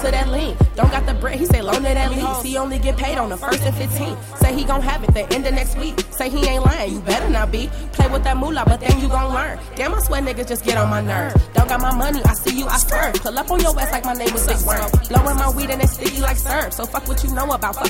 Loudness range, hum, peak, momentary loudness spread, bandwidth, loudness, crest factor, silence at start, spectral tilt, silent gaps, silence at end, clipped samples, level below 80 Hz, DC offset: 2 LU; none; -4 dBFS; 6 LU; 17.5 kHz; -19 LUFS; 12 dB; 0 s; -5 dB/octave; none; 0 s; under 0.1%; -22 dBFS; under 0.1%